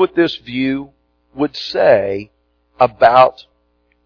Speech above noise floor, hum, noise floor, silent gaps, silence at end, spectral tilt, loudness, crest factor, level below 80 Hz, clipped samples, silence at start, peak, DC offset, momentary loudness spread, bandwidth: 47 dB; 60 Hz at -50 dBFS; -61 dBFS; none; 0.65 s; -6.5 dB/octave; -15 LUFS; 16 dB; -52 dBFS; under 0.1%; 0 s; 0 dBFS; under 0.1%; 12 LU; 5.4 kHz